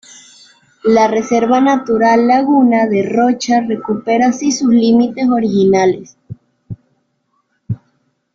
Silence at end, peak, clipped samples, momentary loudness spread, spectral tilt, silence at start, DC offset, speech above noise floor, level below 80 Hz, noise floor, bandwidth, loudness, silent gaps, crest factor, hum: 0.6 s; -2 dBFS; under 0.1%; 16 LU; -5.5 dB/octave; 0.85 s; under 0.1%; 52 dB; -54 dBFS; -64 dBFS; 7.6 kHz; -13 LUFS; none; 12 dB; none